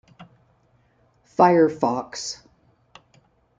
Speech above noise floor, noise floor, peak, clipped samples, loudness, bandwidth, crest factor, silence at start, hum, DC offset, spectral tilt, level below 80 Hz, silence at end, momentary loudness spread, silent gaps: 43 dB; -62 dBFS; -2 dBFS; under 0.1%; -21 LUFS; 9.2 kHz; 22 dB; 0.2 s; none; under 0.1%; -5.5 dB/octave; -66 dBFS; 1.25 s; 16 LU; none